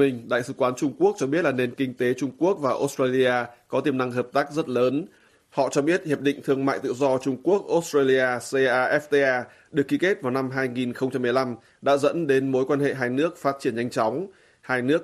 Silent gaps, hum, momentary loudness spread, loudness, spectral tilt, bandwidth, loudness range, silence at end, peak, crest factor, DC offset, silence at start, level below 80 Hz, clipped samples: none; none; 6 LU; -24 LUFS; -5.5 dB/octave; 14 kHz; 2 LU; 0 s; -8 dBFS; 16 dB; under 0.1%; 0 s; -68 dBFS; under 0.1%